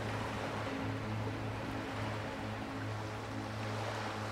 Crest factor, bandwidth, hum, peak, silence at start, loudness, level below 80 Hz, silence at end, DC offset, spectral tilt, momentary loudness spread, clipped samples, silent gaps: 14 dB; 15 kHz; none; -26 dBFS; 0 s; -40 LUFS; -56 dBFS; 0 s; under 0.1%; -6 dB/octave; 2 LU; under 0.1%; none